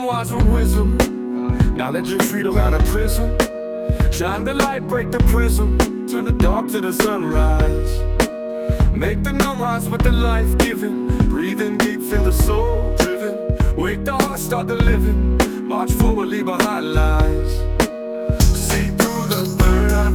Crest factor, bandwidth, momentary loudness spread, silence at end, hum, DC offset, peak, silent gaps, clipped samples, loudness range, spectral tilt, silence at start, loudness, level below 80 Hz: 16 dB; 19 kHz; 5 LU; 0 s; none; under 0.1%; 0 dBFS; none; under 0.1%; 1 LU; -5.5 dB/octave; 0 s; -19 LUFS; -20 dBFS